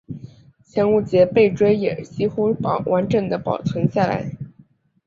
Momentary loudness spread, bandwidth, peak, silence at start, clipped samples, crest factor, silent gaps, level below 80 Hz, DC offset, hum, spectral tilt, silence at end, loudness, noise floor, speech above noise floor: 15 LU; 7.4 kHz; -2 dBFS; 0.1 s; under 0.1%; 18 dB; none; -52 dBFS; under 0.1%; none; -8 dB/octave; 0.55 s; -20 LUFS; -54 dBFS; 35 dB